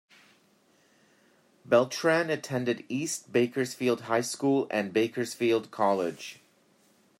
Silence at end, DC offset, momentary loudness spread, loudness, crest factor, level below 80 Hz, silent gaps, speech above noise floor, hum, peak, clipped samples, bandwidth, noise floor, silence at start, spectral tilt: 0.85 s; under 0.1%; 6 LU; -28 LUFS; 20 dB; -78 dBFS; none; 37 dB; none; -8 dBFS; under 0.1%; 16 kHz; -65 dBFS; 1.7 s; -4.5 dB/octave